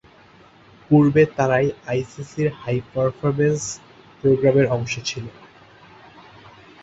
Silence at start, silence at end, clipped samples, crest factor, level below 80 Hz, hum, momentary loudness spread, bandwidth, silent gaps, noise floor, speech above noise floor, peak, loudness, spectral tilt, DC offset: 0.9 s; 1.55 s; under 0.1%; 18 dB; -54 dBFS; none; 13 LU; 8 kHz; none; -50 dBFS; 30 dB; -4 dBFS; -20 LUFS; -6.5 dB/octave; under 0.1%